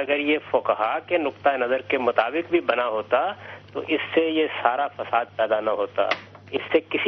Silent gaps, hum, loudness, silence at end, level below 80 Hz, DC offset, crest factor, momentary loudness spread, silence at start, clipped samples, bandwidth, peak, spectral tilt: none; none; -24 LUFS; 0 s; -66 dBFS; under 0.1%; 20 dB; 6 LU; 0 s; under 0.1%; 6.2 kHz; -2 dBFS; -6 dB/octave